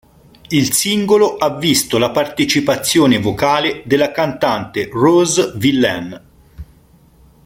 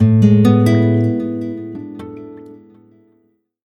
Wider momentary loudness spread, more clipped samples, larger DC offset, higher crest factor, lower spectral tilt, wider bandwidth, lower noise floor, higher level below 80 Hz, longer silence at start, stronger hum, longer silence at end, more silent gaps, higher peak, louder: second, 5 LU vs 22 LU; neither; neither; about the same, 14 dB vs 14 dB; second, -4 dB/octave vs -9 dB/octave; first, 16.5 kHz vs 11.5 kHz; second, -48 dBFS vs -60 dBFS; first, -46 dBFS vs -52 dBFS; first, 0.5 s vs 0 s; neither; second, 0.85 s vs 1.2 s; neither; about the same, -2 dBFS vs 0 dBFS; about the same, -15 LUFS vs -14 LUFS